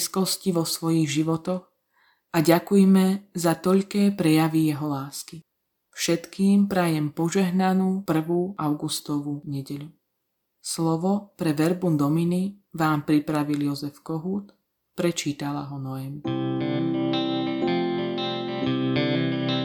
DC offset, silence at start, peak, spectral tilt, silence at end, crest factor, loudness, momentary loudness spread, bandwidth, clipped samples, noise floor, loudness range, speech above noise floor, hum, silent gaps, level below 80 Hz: under 0.1%; 0 s; -4 dBFS; -5.5 dB/octave; 0 s; 20 dB; -24 LUFS; 12 LU; 19 kHz; under 0.1%; -78 dBFS; 6 LU; 54 dB; none; none; -66 dBFS